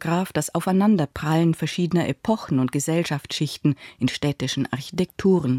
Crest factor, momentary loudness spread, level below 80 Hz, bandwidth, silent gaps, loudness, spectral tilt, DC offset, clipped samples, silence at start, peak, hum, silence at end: 14 dB; 6 LU; -54 dBFS; 16.5 kHz; none; -23 LUFS; -6 dB/octave; under 0.1%; under 0.1%; 0 s; -8 dBFS; none; 0 s